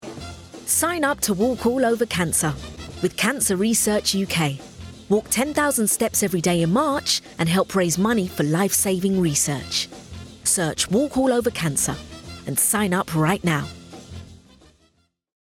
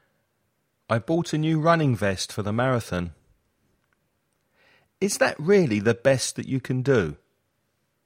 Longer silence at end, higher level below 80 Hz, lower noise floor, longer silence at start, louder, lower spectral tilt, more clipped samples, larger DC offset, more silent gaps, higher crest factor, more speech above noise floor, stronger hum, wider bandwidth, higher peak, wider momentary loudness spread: first, 1.05 s vs 0.9 s; first, -50 dBFS vs -56 dBFS; second, -64 dBFS vs -73 dBFS; second, 0 s vs 0.9 s; first, -21 LUFS vs -24 LUFS; second, -3.5 dB/octave vs -5.5 dB/octave; neither; neither; neither; about the same, 16 dB vs 20 dB; second, 43 dB vs 50 dB; neither; about the same, 17.5 kHz vs 16.5 kHz; about the same, -6 dBFS vs -6 dBFS; first, 16 LU vs 9 LU